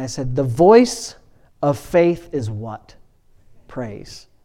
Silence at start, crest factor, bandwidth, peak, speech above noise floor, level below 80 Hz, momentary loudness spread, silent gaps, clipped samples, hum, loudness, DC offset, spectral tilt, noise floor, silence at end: 0 s; 18 dB; 15.5 kHz; 0 dBFS; 33 dB; -44 dBFS; 23 LU; none; under 0.1%; none; -17 LUFS; under 0.1%; -6 dB/octave; -51 dBFS; 0.25 s